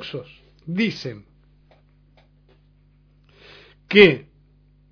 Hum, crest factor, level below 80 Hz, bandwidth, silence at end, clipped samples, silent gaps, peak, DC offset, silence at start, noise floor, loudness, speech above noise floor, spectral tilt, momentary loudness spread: 50 Hz at -55 dBFS; 24 dB; -54 dBFS; 5.4 kHz; 0.7 s; under 0.1%; none; 0 dBFS; under 0.1%; 0 s; -56 dBFS; -18 LUFS; 38 dB; -6.5 dB/octave; 25 LU